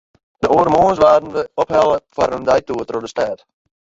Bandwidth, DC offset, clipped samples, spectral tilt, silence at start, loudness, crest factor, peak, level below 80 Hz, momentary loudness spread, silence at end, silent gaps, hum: 7.8 kHz; under 0.1%; under 0.1%; -6 dB/octave; 0.4 s; -16 LUFS; 16 dB; -2 dBFS; -46 dBFS; 11 LU; 0.45 s; none; none